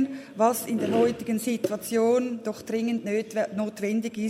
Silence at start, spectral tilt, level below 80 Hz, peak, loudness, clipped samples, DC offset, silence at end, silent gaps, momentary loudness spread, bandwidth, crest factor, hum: 0 s; -5 dB/octave; -70 dBFS; -8 dBFS; -26 LUFS; under 0.1%; under 0.1%; 0 s; none; 6 LU; 16 kHz; 18 dB; none